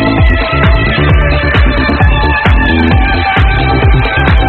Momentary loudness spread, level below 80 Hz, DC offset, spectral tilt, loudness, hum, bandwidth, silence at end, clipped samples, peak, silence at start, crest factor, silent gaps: 1 LU; -12 dBFS; under 0.1%; -8.5 dB/octave; -9 LUFS; none; 4.5 kHz; 0 s; 0.3%; 0 dBFS; 0 s; 8 dB; none